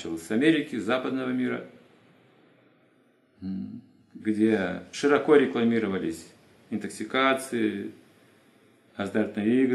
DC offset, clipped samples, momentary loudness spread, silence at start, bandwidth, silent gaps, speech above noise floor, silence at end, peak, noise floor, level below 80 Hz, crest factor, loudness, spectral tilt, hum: under 0.1%; under 0.1%; 15 LU; 0 s; 12.5 kHz; none; 38 dB; 0 s; -6 dBFS; -63 dBFS; -74 dBFS; 22 dB; -26 LUFS; -5.5 dB/octave; none